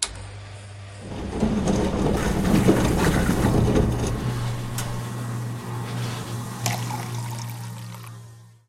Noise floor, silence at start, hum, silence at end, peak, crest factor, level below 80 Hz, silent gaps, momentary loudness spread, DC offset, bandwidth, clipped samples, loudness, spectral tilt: -45 dBFS; 0 s; none; 0.2 s; -4 dBFS; 20 dB; -34 dBFS; none; 18 LU; under 0.1%; 16.5 kHz; under 0.1%; -24 LUFS; -5.5 dB/octave